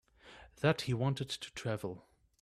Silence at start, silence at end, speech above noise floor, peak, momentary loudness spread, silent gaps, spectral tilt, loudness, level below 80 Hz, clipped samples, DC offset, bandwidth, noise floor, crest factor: 0.25 s; 0.4 s; 23 dB; -14 dBFS; 21 LU; none; -5.5 dB/octave; -36 LUFS; -64 dBFS; under 0.1%; under 0.1%; 14 kHz; -58 dBFS; 22 dB